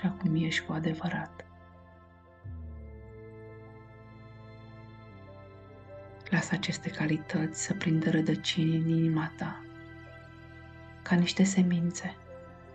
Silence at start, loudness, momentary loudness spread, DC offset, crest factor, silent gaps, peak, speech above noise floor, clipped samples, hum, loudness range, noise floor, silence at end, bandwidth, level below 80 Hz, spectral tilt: 0 s; -30 LUFS; 23 LU; under 0.1%; 18 dB; none; -14 dBFS; 27 dB; under 0.1%; none; 19 LU; -56 dBFS; 0 s; 9 kHz; -58 dBFS; -5.5 dB/octave